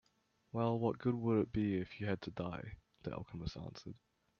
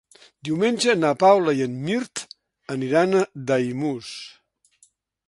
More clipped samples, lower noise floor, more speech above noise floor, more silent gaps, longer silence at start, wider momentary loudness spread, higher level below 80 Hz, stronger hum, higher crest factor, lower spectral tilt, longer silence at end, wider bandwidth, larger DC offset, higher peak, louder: neither; first, -77 dBFS vs -61 dBFS; about the same, 39 dB vs 40 dB; neither; about the same, 0.55 s vs 0.45 s; second, 15 LU vs 20 LU; first, -62 dBFS vs -68 dBFS; neither; about the same, 18 dB vs 20 dB; first, -8.5 dB/octave vs -5 dB/octave; second, 0.45 s vs 1 s; second, 6.8 kHz vs 11.5 kHz; neither; second, -22 dBFS vs -4 dBFS; second, -39 LUFS vs -22 LUFS